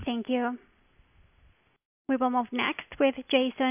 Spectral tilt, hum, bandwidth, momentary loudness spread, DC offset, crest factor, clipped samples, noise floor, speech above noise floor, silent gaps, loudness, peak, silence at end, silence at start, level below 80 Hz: -8 dB/octave; none; 3.7 kHz; 8 LU; under 0.1%; 20 dB; under 0.1%; -63 dBFS; 35 dB; 1.85-2.05 s; -28 LUFS; -10 dBFS; 0 s; 0 s; -60 dBFS